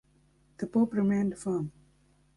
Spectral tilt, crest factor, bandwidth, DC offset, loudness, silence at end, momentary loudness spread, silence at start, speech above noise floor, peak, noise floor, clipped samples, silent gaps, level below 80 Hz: -8.5 dB/octave; 16 dB; 11.5 kHz; under 0.1%; -30 LUFS; 0.65 s; 12 LU; 0.6 s; 37 dB; -14 dBFS; -65 dBFS; under 0.1%; none; -64 dBFS